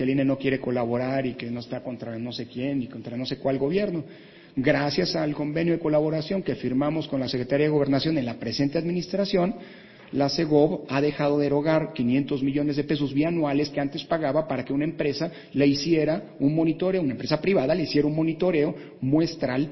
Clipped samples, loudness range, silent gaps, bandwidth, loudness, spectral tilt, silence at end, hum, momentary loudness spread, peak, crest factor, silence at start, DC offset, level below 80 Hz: under 0.1%; 4 LU; none; 6.2 kHz; -25 LUFS; -7 dB/octave; 0 s; none; 9 LU; -6 dBFS; 18 dB; 0 s; under 0.1%; -56 dBFS